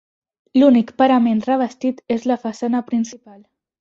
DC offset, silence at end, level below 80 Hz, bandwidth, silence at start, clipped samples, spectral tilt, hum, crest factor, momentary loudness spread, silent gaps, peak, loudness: under 0.1%; 0.65 s; -62 dBFS; 7.6 kHz; 0.55 s; under 0.1%; -6 dB/octave; none; 16 dB; 9 LU; none; -2 dBFS; -18 LUFS